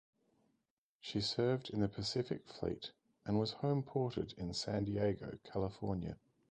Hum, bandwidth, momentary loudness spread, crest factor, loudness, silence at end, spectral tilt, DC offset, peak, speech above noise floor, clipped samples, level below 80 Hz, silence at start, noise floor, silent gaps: none; 9.6 kHz; 10 LU; 18 dB; -39 LUFS; 0.35 s; -6 dB/octave; under 0.1%; -22 dBFS; 47 dB; under 0.1%; -60 dBFS; 1.05 s; -86 dBFS; none